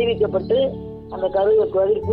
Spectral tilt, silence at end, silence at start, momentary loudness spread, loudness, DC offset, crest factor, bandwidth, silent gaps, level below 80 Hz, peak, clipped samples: -9 dB/octave; 0 s; 0 s; 11 LU; -20 LUFS; under 0.1%; 10 dB; 4.7 kHz; none; -44 dBFS; -8 dBFS; under 0.1%